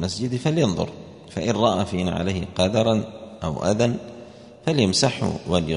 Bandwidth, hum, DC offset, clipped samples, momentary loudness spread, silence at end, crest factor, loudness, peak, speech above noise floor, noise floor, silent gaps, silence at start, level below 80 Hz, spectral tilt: 10.5 kHz; none; under 0.1%; under 0.1%; 13 LU; 0 s; 18 dB; -23 LUFS; -4 dBFS; 20 dB; -42 dBFS; none; 0 s; -48 dBFS; -5.5 dB/octave